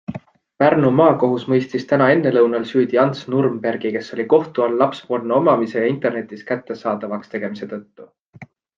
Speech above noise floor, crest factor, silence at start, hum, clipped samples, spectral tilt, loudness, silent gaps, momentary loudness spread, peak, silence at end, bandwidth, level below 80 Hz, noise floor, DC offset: 26 dB; 16 dB; 0.1 s; none; under 0.1%; -8 dB/octave; -18 LUFS; 8.21-8.33 s; 12 LU; -2 dBFS; 0.35 s; 7.4 kHz; -64 dBFS; -44 dBFS; under 0.1%